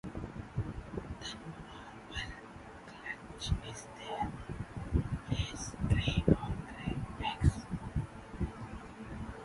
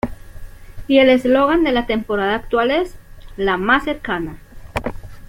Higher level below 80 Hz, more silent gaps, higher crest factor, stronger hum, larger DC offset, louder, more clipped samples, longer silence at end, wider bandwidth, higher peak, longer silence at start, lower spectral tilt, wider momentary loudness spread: second, -44 dBFS vs -36 dBFS; neither; first, 26 dB vs 16 dB; neither; neither; second, -38 LUFS vs -17 LUFS; neither; about the same, 0 s vs 0.05 s; second, 11.5 kHz vs 16.5 kHz; second, -12 dBFS vs -2 dBFS; about the same, 0.05 s vs 0.05 s; about the same, -6 dB/octave vs -6 dB/octave; about the same, 15 LU vs 16 LU